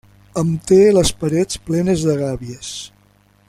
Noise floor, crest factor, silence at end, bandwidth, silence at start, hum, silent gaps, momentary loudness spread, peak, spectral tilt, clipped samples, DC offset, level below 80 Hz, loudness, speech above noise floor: -54 dBFS; 16 dB; 0.6 s; 15 kHz; 0.35 s; 50 Hz at -40 dBFS; none; 17 LU; -2 dBFS; -5.5 dB/octave; under 0.1%; under 0.1%; -40 dBFS; -16 LUFS; 38 dB